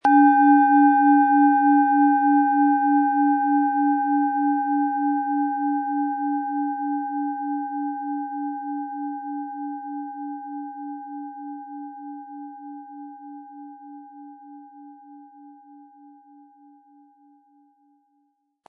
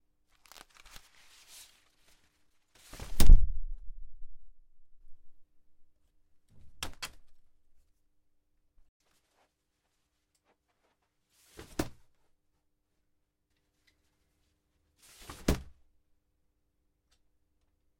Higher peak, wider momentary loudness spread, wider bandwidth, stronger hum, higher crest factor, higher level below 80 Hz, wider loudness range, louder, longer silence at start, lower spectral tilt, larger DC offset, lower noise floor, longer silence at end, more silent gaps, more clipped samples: about the same, -6 dBFS vs -6 dBFS; second, 23 LU vs 29 LU; second, 3.3 kHz vs 16 kHz; neither; second, 16 dB vs 24 dB; second, -88 dBFS vs -34 dBFS; first, 23 LU vs 15 LU; first, -21 LUFS vs -33 LUFS; second, 0.05 s vs 3.1 s; first, -7 dB/octave vs -5 dB/octave; neither; second, -70 dBFS vs -80 dBFS; first, 3.15 s vs 2.45 s; second, none vs 8.89-9.00 s; neither